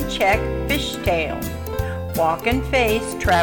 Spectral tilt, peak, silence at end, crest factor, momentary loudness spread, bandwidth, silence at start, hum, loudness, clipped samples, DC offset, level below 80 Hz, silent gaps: -5 dB/octave; -4 dBFS; 0 s; 16 dB; 8 LU; 19 kHz; 0 s; none; -21 LUFS; under 0.1%; under 0.1%; -32 dBFS; none